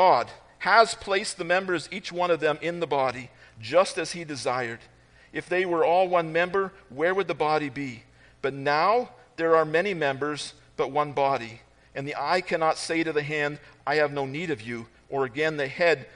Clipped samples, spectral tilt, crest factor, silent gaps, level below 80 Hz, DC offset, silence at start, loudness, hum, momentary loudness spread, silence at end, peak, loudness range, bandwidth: under 0.1%; -4.5 dB/octave; 22 dB; none; -62 dBFS; under 0.1%; 0 s; -26 LUFS; none; 14 LU; 0.1 s; -4 dBFS; 2 LU; 10.5 kHz